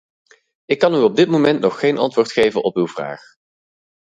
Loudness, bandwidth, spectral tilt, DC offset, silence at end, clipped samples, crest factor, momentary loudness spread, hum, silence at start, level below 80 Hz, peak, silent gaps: -17 LUFS; 9.4 kHz; -6 dB/octave; under 0.1%; 0.95 s; under 0.1%; 18 dB; 10 LU; none; 0.7 s; -60 dBFS; 0 dBFS; none